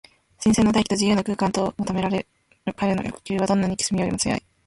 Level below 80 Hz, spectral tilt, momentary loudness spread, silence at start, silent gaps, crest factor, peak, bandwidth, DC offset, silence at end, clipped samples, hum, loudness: -48 dBFS; -5 dB/octave; 9 LU; 0.4 s; none; 16 dB; -6 dBFS; 11.5 kHz; under 0.1%; 0.3 s; under 0.1%; none; -23 LUFS